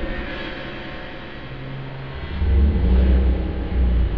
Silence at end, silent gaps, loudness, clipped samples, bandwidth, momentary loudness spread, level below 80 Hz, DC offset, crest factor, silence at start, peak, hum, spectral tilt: 0 s; none; -23 LUFS; under 0.1%; 5 kHz; 15 LU; -22 dBFS; 1%; 14 dB; 0 s; -8 dBFS; none; -9.5 dB/octave